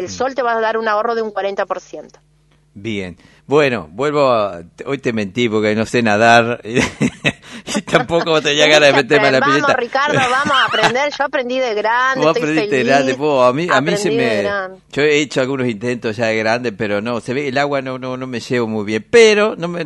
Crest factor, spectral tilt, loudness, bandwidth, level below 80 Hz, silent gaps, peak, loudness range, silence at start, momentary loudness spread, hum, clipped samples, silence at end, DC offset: 16 dB; -4.5 dB/octave; -15 LUFS; 12 kHz; -52 dBFS; none; 0 dBFS; 6 LU; 0 s; 12 LU; none; under 0.1%; 0 s; under 0.1%